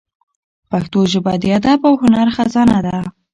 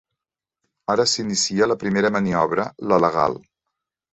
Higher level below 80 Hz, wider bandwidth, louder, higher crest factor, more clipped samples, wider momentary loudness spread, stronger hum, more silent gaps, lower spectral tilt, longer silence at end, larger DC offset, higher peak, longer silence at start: first, -44 dBFS vs -56 dBFS; first, 10.5 kHz vs 8.2 kHz; first, -14 LUFS vs -20 LUFS; second, 14 dB vs 20 dB; neither; first, 10 LU vs 5 LU; neither; neither; first, -6.5 dB/octave vs -4 dB/octave; second, 0.25 s vs 0.75 s; neither; about the same, -2 dBFS vs -2 dBFS; second, 0.7 s vs 0.9 s